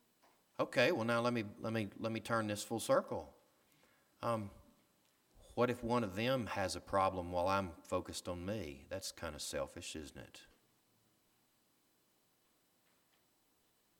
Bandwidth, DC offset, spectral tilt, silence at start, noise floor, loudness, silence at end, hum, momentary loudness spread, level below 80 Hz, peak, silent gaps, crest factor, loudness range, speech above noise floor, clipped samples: 19 kHz; under 0.1%; -4.5 dB/octave; 0.6 s; -76 dBFS; -38 LUFS; 3.55 s; none; 12 LU; -66 dBFS; -16 dBFS; none; 24 dB; 10 LU; 38 dB; under 0.1%